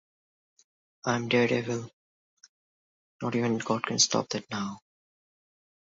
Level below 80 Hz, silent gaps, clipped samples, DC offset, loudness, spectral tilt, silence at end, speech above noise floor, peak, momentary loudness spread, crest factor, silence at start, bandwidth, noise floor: -70 dBFS; 1.93-2.37 s, 2.49-3.19 s; under 0.1%; under 0.1%; -28 LUFS; -3.5 dB/octave; 1.2 s; over 62 dB; -10 dBFS; 13 LU; 22 dB; 1.05 s; 7.8 kHz; under -90 dBFS